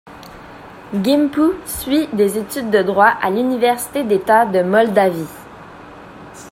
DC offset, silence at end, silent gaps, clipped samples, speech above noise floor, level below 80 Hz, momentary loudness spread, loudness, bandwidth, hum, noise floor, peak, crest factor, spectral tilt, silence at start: under 0.1%; 0 s; none; under 0.1%; 22 dB; -50 dBFS; 24 LU; -16 LUFS; 16.5 kHz; none; -37 dBFS; 0 dBFS; 18 dB; -5 dB/octave; 0.05 s